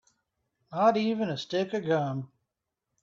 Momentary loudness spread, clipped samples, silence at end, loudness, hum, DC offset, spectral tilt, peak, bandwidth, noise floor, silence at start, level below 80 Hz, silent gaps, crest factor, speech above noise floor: 14 LU; under 0.1%; 0.75 s; -28 LUFS; none; under 0.1%; -6.5 dB/octave; -12 dBFS; 7.6 kHz; -85 dBFS; 0.7 s; -74 dBFS; none; 18 dB; 58 dB